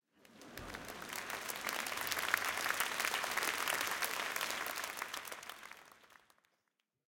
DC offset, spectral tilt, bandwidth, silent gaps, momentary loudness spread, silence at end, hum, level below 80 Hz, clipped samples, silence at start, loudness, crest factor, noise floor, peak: under 0.1%; 0 dB/octave; 17 kHz; none; 15 LU; 1 s; none; -72 dBFS; under 0.1%; 0.3 s; -38 LUFS; 28 dB; -85 dBFS; -12 dBFS